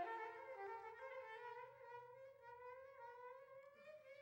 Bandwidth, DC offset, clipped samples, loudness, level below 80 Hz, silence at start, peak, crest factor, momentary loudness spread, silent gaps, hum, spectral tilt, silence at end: 16 kHz; under 0.1%; under 0.1%; -56 LUFS; under -90 dBFS; 0 s; -38 dBFS; 18 dB; 9 LU; none; none; -4.5 dB/octave; 0 s